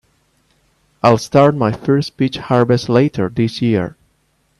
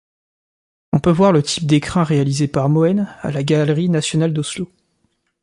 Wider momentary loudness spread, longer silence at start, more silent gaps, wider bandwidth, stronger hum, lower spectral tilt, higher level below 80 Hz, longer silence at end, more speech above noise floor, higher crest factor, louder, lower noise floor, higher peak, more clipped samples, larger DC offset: about the same, 7 LU vs 9 LU; about the same, 1.05 s vs 0.95 s; neither; about the same, 12 kHz vs 11.5 kHz; neither; about the same, -7 dB/octave vs -6 dB/octave; about the same, -50 dBFS vs -48 dBFS; about the same, 0.7 s vs 0.8 s; about the same, 47 dB vs 50 dB; about the same, 16 dB vs 16 dB; about the same, -15 LUFS vs -17 LUFS; second, -61 dBFS vs -66 dBFS; about the same, 0 dBFS vs -2 dBFS; neither; neither